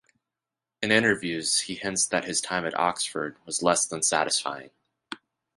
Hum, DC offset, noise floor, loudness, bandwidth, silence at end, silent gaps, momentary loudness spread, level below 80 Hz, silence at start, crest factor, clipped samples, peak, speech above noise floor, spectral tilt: none; under 0.1%; -89 dBFS; -25 LUFS; 11.5 kHz; 0.4 s; none; 16 LU; -64 dBFS; 0.8 s; 24 dB; under 0.1%; -4 dBFS; 62 dB; -2 dB/octave